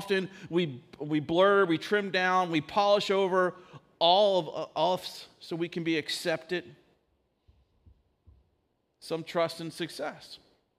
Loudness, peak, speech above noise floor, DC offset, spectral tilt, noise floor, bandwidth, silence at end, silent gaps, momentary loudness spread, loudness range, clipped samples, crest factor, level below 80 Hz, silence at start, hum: -28 LUFS; -10 dBFS; 47 dB; under 0.1%; -5 dB/octave; -75 dBFS; 15.5 kHz; 0.45 s; none; 15 LU; 12 LU; under 0.1%; 20 dB; -72 dBFS; 0 s; none